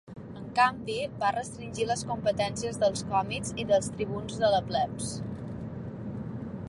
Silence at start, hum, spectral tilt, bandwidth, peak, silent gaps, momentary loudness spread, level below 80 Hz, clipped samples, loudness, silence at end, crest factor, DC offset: 0.05 s; none; -4.5 dB/octave; 11.5 kHz; -10 dBFS; none; 13 LU; -54 dBFS; under 0.1%; -30 LUFS; 0 s; 20 dB; under 0.1%